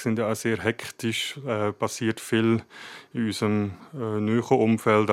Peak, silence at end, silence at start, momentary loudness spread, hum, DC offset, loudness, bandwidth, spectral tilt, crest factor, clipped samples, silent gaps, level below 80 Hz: -6 dBFS; 0 s; 0 s; 10 LU; none; under 0.1%; -26 LUFS; 15.5 kHz; -5.5 dB/octave; 20 dB; under 0.1%; none; -70 dBFS